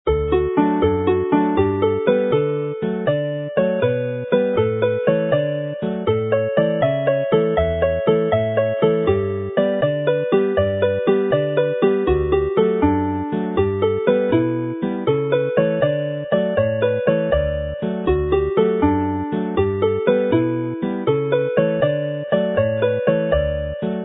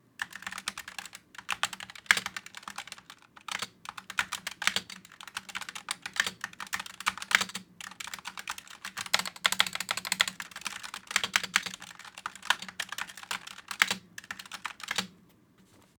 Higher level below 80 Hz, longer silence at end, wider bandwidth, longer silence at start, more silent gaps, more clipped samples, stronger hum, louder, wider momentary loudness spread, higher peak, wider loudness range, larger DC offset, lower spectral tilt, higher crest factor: first, -36 dBFS vs -72 dBFS; second, 0 s vs 0.85 s; second, 4 kHz vs over 20 kHz; second, 0.05 s vs 0.2 s; neither; neither; neither; first, -19 LUFS vs -32 LUFS; second, 5 LU vs 16 LU; about the same, -2 dBFS vs 0 dBFS; second, 1 LU vs 4 LU; neither; first, -12.5 dB/octave vs 0.5 dB/octave; second, 16 dB vs 36 dB